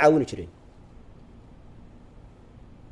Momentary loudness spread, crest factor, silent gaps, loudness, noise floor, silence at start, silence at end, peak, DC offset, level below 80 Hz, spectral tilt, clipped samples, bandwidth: 24 LU; 22 dB; none; -25 LUFS; -49 dBFS; 0 s; 2.45 s; -6 dBFS; under 0.1%; -52 dBFS; -6.5 dB/octave; under 0.1%; 11.5 kHz